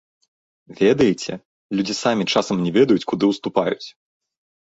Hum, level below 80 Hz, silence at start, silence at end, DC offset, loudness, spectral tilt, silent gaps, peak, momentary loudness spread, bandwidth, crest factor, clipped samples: none; -58 dBFS; 0.7 s; 0.9 s; under 0.1%; -20 LUFS; -5.5 dB/octave; 1.45-1.69 s; -2 dBFS; 13 LU; 8 kHz; 18 dB; under 0.1%